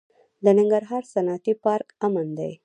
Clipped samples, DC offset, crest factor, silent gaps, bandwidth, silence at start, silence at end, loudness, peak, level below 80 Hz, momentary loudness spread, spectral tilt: under 0.1%; under 0.1%; 18 dB; none; 9.6 kHz; 0.4 s; 0.1 s; -23 LUFS; -4 dBFS; -76 dBFS; 8 LU; -8 dB/octave